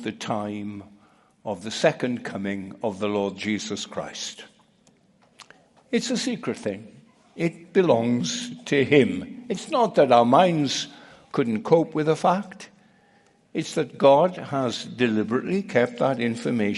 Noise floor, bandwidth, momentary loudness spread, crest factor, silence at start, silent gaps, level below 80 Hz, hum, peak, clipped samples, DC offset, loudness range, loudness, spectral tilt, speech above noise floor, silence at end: -60 dBFS; 11.5 kHz; 15 LU; 20 dB; 0 s; none; -68 dBFS; none; -4 dBFS; under 0.1%; under 0.1%; 10 LU; -24 LUFS; -5 dB/octave; 37 dB; 0 s